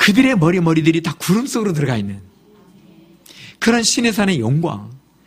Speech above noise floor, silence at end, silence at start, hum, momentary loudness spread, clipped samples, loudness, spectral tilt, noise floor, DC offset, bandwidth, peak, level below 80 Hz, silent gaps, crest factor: 32 dB; 0.3 s; 0 s; none; 10 LU; under 0.1%; -16 LUFS; -4.5 dB/octave; -48 dBFS; under 0.1%; 15.5 kHz; 0 dBFS; -50 dBFS; none; 18 dB